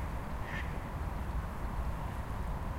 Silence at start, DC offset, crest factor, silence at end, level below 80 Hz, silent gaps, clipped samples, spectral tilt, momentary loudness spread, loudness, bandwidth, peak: 0 s; under 0.1%; 12 dB; 0 s; -40 dBFS; none; under 0.1%; -6.5 dB/octave; 1 LU; -40 LUFS; 16 kHz; -24 dBFS